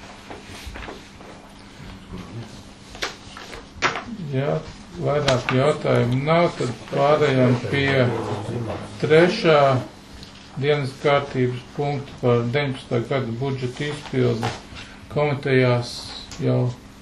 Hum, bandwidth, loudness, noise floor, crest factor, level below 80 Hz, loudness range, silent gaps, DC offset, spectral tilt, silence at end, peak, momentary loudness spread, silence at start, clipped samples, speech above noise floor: none; 12 kHz; -22 LUFS; -42 dBFS; 20 dB; -48 dBFS; 11 LU; none; under 0.1%; -6.5 dB/octave; 0 s; -2 dBFS; 21 LU; 0 s; under 0.1%; 22 dB